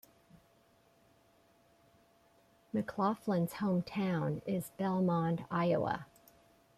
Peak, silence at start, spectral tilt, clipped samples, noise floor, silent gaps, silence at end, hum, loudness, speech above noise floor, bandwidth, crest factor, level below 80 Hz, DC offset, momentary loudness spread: -20 dBFS; 0.35 s; -7.5 dB/octave; under 0.1%; -68 dBFS; none; 0.75 s; none; -35 LUFS; 34 dB; 15 kHz; 16 dB; -70 dBFS; under 0.1%; 7 LU